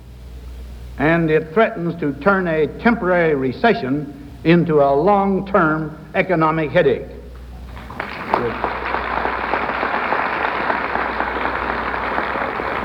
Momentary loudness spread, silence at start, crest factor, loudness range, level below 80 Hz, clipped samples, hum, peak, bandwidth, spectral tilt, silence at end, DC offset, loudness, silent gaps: 19 LU; 0 s; 18 dB; 5 LU; -38 dBFS; under 0.1%; none; 0 dBFS; 9.2 kHz; -8 dB/octave; 0 s; under 0.1%; -18 LUFS; none